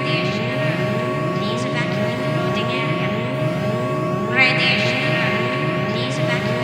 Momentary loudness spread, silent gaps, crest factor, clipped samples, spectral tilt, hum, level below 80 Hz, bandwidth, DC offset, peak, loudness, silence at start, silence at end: 6 LU; none; 18 dB; under 0.1%; -6 dB/octave; none; -54 dBFS; 15.5 kHz; under 0.1%; 0 dBFS; -19 LUFS; 0 s; 0 s